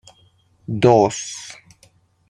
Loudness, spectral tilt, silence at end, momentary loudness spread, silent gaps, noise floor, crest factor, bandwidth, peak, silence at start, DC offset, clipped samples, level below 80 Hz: -18 LUFS; -5.5 dB/octave; 0.75 s; 23 LU; none; -57 dBFS; 20 dB; 11 kHz; -2 dBFS; 0.7 s; under 0.1%; under 0.1%; -56 dBFS